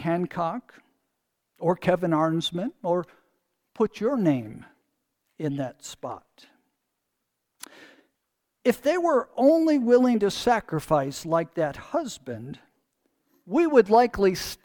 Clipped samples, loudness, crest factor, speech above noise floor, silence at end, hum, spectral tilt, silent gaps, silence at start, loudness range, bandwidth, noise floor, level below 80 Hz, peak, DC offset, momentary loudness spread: under 0.1%; -24 LUFS; 22 dB; 56 dB; 0.1 s; none; -6 dB/octave; none; 0 s; 15 LU; 19 kHz; -80 dBFS; -58 dBFS; -4 dBFS; under 0.1%; 18 LU